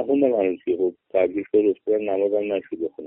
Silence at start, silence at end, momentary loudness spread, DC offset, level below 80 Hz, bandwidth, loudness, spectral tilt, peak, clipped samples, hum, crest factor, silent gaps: 0 s; 0 s; 5 LU; under 0.1%; -66 dBFS; 3.7 kHz; -23 LUFS; -5.5 dB/octave; -6 dBFS; under 0.1%; none; 16 dB; none